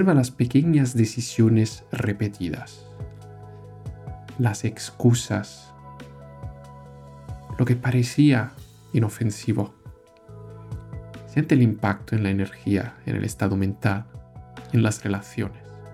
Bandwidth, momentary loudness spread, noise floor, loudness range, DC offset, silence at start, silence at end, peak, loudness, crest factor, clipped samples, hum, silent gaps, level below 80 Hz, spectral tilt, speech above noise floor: 14 kHz; 23 LU; -46 dBFS; 4 LU; under 0.1%; 0 s; 0 s; -6 dBFS; -23 LUFS; 18 dB; under 0.1%; none; none; -50 dBFS; -6.5 dB/octave; 24 dB